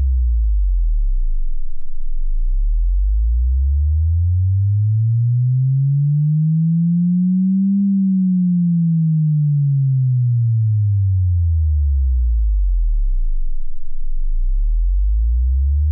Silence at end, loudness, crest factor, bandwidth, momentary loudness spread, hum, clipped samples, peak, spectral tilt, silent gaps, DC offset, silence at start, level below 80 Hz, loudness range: 0 s; -18 LUFS; 4 dB; 0.3 kHz; 11 LU; none; under 0.1%; -12 dBFS; -29.5 dB/octave; none; under 0.1%; 0 s; -18 dBFS; 6 LU